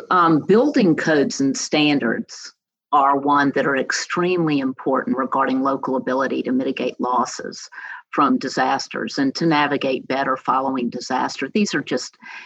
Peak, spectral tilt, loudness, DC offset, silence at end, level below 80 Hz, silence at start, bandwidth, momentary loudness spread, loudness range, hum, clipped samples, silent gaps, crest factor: -4 dBFS; -4.5 dB/octave; -20 LUFS; under 0.1%; 0 s; -74 dBFS; 0 s; 8.4 kHz; 10 LU; 3 LU; none; under 0.1%; none; 14 dB